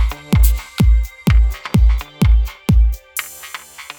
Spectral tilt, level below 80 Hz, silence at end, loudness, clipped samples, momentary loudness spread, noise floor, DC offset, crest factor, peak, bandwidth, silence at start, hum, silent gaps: -6 dB/octave; -16 dBFS; 0.05 s; -17 LUFS; under 0.1%; 12 LU; -34 dBFS; under 0.1%; 14 dB; 0 dBFS; over 20 kHz; 0 s; none; none